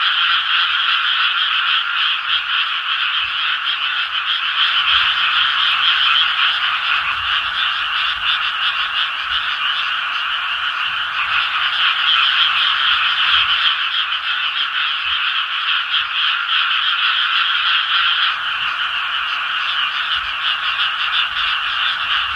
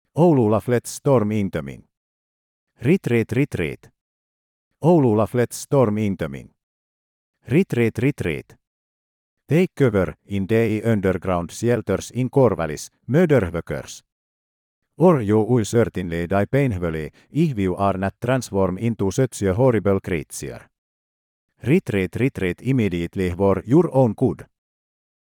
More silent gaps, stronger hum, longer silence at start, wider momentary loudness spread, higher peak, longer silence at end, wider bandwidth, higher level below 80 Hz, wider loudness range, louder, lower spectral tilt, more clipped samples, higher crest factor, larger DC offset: second, none vs 1.97-2.67 s, 4.01-4.71 s, 6.63-7.34 s, 8.67-9.37 s, 14.12-14.82 s, 20.78-21.48 s; neither; second, 0 s vs 0.15 s; second, 6 LU vs 11 LU; about the same, -2 dBFS vs -4 dBFS; second, 0 s vs 0.85 s; second, 13 kHz vs 18 kHz; about the same, -54 dBFS vs -52 dBFS; about the same, 3 LU vs 3 LU; first, -15 LUFS vs -21 LUFS; second, 1 dB/octave vs -7 dB/octave; neither; about the same, 16 dB vs 18 dB; neither